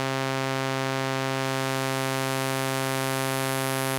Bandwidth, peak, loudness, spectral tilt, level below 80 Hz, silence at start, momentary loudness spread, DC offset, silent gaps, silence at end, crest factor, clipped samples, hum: 17 kHz; -8 dBFS; -27 LUFS; -4 dB/octave; -72 dBFS; 0 s; 1 LU; under 0.1%; none; 0 s; 18 dB; under 0.1%; none